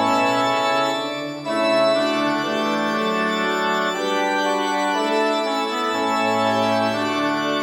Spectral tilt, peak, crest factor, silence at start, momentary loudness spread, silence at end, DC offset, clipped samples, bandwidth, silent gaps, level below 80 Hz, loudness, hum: -4 dB/octave; -6 dBFS; 14 dB; 0 s; 4 LU; 0 s; under 0.1%; under 0.1%; 16.5 kHz; none; -66 dBFS; -20 LUFS; none